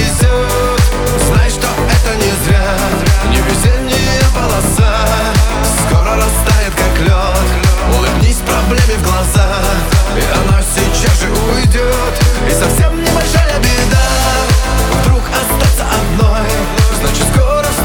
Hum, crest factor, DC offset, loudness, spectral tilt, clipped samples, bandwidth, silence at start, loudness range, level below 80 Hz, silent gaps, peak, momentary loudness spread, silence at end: none; 10 dB; under 0.1%; -12 LUFS; -4.5 dB/octave; under 0.1%; 20 kHz; 0 s; 0 LU; -14 dBFS; none; 0 dBFS; 2 LU; 0 s